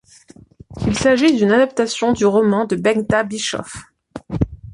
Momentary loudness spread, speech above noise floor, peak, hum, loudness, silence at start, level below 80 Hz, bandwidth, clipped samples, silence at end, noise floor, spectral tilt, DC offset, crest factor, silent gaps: 16 LU; 30 dB; -2 dBFS; none; -17 LUFS; 0.7 s; -40 dBFS; 11.5 kHz; under 0.1%; 0 s; -46 dBFS; -5 dB/octave; under 0.1%; 16 dB; none